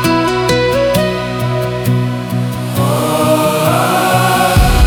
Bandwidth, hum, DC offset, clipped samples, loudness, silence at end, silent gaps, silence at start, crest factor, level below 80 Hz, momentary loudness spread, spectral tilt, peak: over 20 kHz; none; under 0.1%; under 0.1%; -13 LUFS; 0 s; none; 0 s; 12 dB; -22 dBFS; 7 LU; -5.5 dB/octave; 0 dBFS